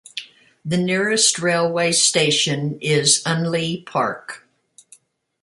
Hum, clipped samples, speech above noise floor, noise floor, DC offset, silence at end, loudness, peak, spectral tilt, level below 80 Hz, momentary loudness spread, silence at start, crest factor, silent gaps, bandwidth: none; under 0.1%; 35 dB; -54 dBFS; under 0.1%; 1.05 s; -18 LUFS; -2 dBFS; -3 dB/octave; -64 dBFS; 18 LU; 0.15 s; 18 dB; none; 11.5 kHz